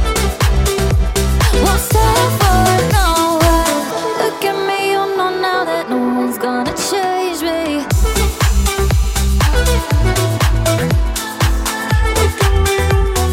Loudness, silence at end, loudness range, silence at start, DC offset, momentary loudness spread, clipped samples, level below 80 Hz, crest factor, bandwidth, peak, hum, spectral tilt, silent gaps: -15 LUFS; 0 s; 3 LU; 0 s; under 0.1%; 5 LU; under 0.1%; -18 dBFS; 12 dB; 17 kHz; -2 dBFS; none; -4.5 dB/octave; none